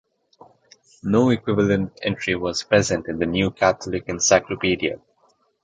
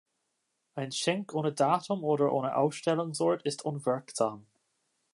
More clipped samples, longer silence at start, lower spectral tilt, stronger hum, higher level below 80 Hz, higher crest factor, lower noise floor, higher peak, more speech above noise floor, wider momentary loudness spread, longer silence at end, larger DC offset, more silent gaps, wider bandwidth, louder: neither; first, 1.05 s vs 0.75 s; about the same, -4.5 dB/octave vs -5 dB/octave; neither; first, -48 dBFS vs -82 dBFS; about the same, 20 dB vs 20 dB; second, -63 dBFS vs -80 dBFS; first, -2 dBFS vs -12 dBFS; second, 42 dB vs 50 dB; first, 9 LU vs 6 LU; about the same, 0.65 s vs 0.7 s; neither; neither; second, 9.4 kHz vs 11.5 kHz; first, -21 LUFS vs -30 LUFS